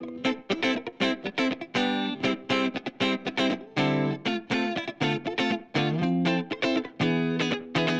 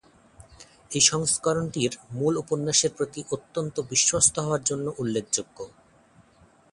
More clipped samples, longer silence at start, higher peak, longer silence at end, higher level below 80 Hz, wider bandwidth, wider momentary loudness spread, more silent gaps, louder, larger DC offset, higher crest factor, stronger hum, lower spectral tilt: neither; second, 0 s vs 0.4 s; second, -10 dBFS vs -6 dBFS; second, 0 s vs 1.05 s; second, -64 dBFS vs -58 dBFS; second, 9 kHz vs 11.5 kHz; second, 3 LU vs 13 LU; neither; second, -27 LUFS vs -24 LUFS; neither; second, 16 dB vs 22 dB; neither; first, -5.5 dB/octave vs -3 dB/octave